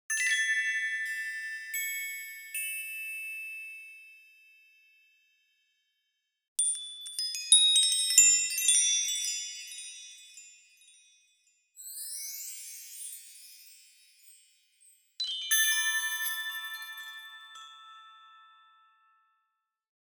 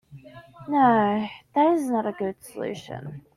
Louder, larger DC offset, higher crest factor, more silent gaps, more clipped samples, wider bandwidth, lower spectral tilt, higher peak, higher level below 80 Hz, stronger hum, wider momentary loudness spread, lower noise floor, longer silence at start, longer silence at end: second, -27 LUFS vs -24 LUFS; neither; first, 26 dB vs 16 dB; first, 6.48-6.56 s vs none; neither; first, over 20 kHz vs 14.5 kHz; second, 9 dB/octave vs -6.5 dB/octave; about the same, -6 dBFS vs -8 dBFS; second, under -90 dBFS vs -64 dBFS; neither; first, 25 LU vs 17 LU; first, -82 dBFS vs -46 dBFS; about the same, 0.1 s vs 0.1 s; first, 1.75 s vs 0.15 s